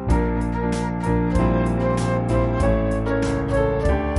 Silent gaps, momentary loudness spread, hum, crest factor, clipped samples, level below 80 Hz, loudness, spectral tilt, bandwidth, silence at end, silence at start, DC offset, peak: none; 3 LU; none; 14 dB; under 0.1%; -26 dBFS; -21 LUFS; -7.5 dB/octave; 11.5 kHz; 0 s; 0 s; under 0.1%; -8 dBFS